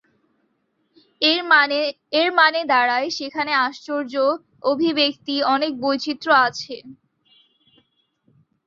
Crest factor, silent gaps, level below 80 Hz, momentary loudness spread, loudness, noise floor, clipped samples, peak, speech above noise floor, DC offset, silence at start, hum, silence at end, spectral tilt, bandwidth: 20 dB; none; -72 dBFS; 10 LU; -19 LUFS; -69 dBFS; under 0.1%; -2 dBFS; 49 dB; under 0.1%; 1.2 s; none; 1.75 s; -3 dB/octave; 7.6 kHz